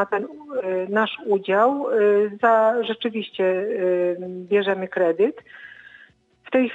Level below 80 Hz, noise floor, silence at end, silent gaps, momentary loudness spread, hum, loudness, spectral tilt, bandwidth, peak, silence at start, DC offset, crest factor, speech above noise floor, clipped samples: -72 dBFS; -53 dBFS; 0 s; none; 11 LU; none; -21 LUFS; -7 dB/octave; 7.6 kHz; -6 dBFS; 0 s; under 0.1%; 16 dB; 32 dB; under 0.1%